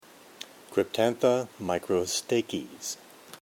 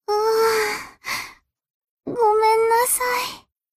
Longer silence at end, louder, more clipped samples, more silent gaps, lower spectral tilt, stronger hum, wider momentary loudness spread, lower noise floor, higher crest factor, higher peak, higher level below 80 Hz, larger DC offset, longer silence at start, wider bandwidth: second, 0.05 s vs 0.4 s; second, -29 LUFS vs -20 LUFS; neither; second, none vs 1.70-1.82 s, 1.89-1.97 s; first, -4 dB/octave vs -1 dB/octave; neither; first, 19 LU vs 14 LU; first, -48 dBFS vs -42 dBFS; first, 20 dB vs 14 dB; about the same, -10 dBFS vs -8 dBFS; second, -68 dBFS vs -58 dBFS; neither; first, 0.4 s vs 0.1 s; first, 18 kHz vs 15.5 kHz